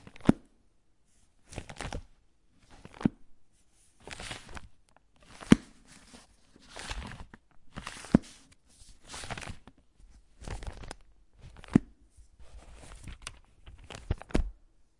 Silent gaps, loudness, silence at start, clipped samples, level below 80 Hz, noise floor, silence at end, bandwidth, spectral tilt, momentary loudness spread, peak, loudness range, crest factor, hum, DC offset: none; -33 LUFS; 0.15 s; under 0.1%; -46 dBFS; -68 dBFS; 0.5 s; 11.5 kHz; -6 dB/octave; 26 LU; 0 dBFS; 8 LU; 36 dB; none; under 0.1%